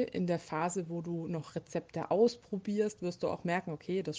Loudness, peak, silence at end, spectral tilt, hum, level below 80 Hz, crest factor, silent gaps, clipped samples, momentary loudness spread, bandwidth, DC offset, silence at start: -35 LUFS; -16 dBFS; 0 s; -6 dB/octave; none; -72 dBFS; 18 dB; none; under 0.1%; 10 LU; 9.6 kHz; under 0.1%; 0 s